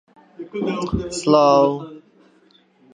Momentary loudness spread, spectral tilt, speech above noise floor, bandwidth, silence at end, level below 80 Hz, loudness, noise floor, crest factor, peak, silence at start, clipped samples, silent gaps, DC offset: 20 LU; -5.5 dB/octave; 38 dB; 10.5 kHz; 0.95 s; -44 dBFS; -18 LUFS; -56 dBFS; 20 dB; -2 dBFS; 0.4 s; under 0.1%; none; under 0.1%